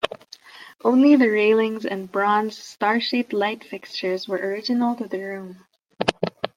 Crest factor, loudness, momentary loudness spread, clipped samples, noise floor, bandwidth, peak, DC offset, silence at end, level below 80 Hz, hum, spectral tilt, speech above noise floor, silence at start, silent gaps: 22 dB; -22 LUFS; 16 LU; under 0.1%; -45 dBFS; 14 kHz; 0 dBFS; under 0.1%; 0.1 s; -64 dBFS; none; -5.5 dB/octave; 24 dB; 0.05 s; none